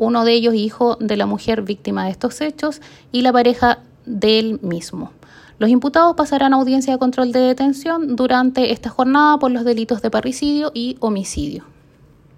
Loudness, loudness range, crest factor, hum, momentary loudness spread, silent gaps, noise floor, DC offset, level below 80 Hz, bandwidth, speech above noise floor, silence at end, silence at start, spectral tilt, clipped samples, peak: -17 LUFS; 3 LU; 16 dB; none; 11 LU; none; -49 dBFS; under 0.1%; -46 dBFS; 14 kHz; 32 dB; 0.8 s; 0 s; -5 dB/octave; under 0.1%; 0 dBFS